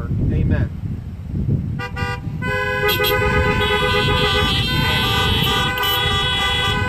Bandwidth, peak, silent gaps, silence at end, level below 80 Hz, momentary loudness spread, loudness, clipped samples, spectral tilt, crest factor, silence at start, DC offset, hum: 15 kHz; -4 dBFS; none; 0 s; -28 dBFS; 9 LU; -18 LUFS; under 0.1%; -4.5 dB/octave; 14 dB; 0 s; under 0.1%; none